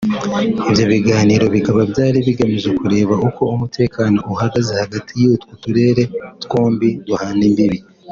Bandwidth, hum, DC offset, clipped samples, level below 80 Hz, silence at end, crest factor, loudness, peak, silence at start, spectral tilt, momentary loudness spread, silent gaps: 7.4 kHz; none; under 0.1%; under 0.1%; -46 dBFS; 0 s; 14 dB; -16 LUFS; -2 dBFS; 0 s; -7 dB/octave; 7 LU; none